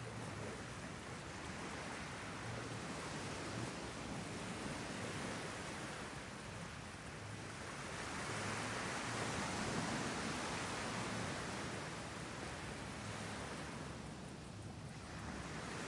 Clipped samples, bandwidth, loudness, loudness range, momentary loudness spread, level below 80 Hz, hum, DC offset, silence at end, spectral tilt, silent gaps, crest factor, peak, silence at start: under 0.1%; 11.5 kHz; -45 LUFS; 5 LU; 8 LU; -62 dBFS; none; under 0.1%; 0 s; -4 dB/octave; none; 18 dB; -28 dBFS; 0 s